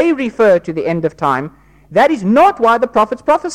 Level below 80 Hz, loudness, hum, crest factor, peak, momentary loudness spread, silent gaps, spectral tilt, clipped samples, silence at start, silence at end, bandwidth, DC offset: -48 dBFS; -13 LUFS; none; 10 dB; -2 dBFS; 8 LU; none; -6.5 dB/octave; under 0.1%; 0 s; 0 s; 14.5 kHz; under 0.1%